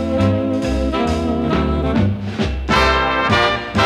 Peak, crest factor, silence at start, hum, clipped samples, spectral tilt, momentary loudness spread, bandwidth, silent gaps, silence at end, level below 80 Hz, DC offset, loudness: -2 dBFS; 16 dB; 0 s; none; under 0.1%; -6 dB/octave; 5 LU; 13 kHz; none; 0 s; -28 dBFS; under 0.1%; -17 LUFS